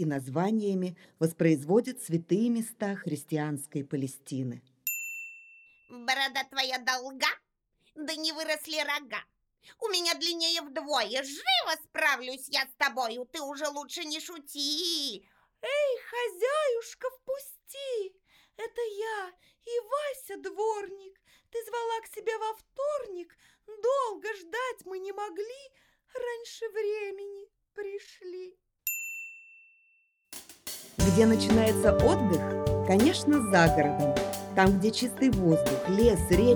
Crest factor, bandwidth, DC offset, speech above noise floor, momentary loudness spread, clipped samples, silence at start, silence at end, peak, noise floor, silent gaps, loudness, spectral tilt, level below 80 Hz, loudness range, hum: 20 dB; over 20 kHz; under 0.1%; 43 dB; 17 LU; under 0.1%; 0 s; 0 s; -8 dBFS; -72 dBFS; none; -29 LUFS; -4.5 dB/octave; -48 dBFS; 12 LU; none